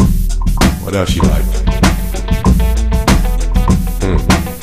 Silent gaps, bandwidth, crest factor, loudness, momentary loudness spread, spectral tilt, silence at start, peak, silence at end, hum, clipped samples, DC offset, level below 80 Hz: none; 15.5 kHz; 12 dB; -14 LUFS; 4 LU; -5.5 dB/octave; 0 s; 0 dBFS; 0 s; none; under 0.1%; under 0.1%; -14 dBFS